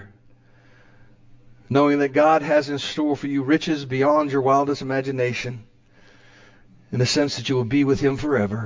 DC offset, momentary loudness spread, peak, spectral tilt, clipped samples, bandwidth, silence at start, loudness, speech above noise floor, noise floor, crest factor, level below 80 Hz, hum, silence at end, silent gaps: under 0.1%; 7 LU; -6 dBFS; -6 dB/octave; under 0.1%; 7.6 kHz; 0 s; -21 LUFS; 32 dB; -52 dBFS; 16 dB; -52 dBFS; none; 0 s; none